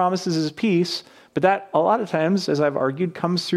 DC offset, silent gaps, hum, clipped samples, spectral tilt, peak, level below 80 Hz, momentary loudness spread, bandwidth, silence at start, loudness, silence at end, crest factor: under 0.1%; none; none; under 0.1%; -6 dB/octave; -4 dBFS; -68 dBFS; 5 LU; 13.5 kHz; 0 s; -22 LUFS; 0 s; 16 dB